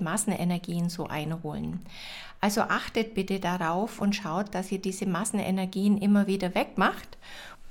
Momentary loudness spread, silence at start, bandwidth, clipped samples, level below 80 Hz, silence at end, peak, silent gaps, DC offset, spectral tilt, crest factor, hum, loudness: 15 LU; 0 s; 17 kHz; under 0.1%; -54 dBFS; 0 s; -12 dBFS; none; under 0.1%; -5 dB/octave; 16 dB; none; -28 LUFS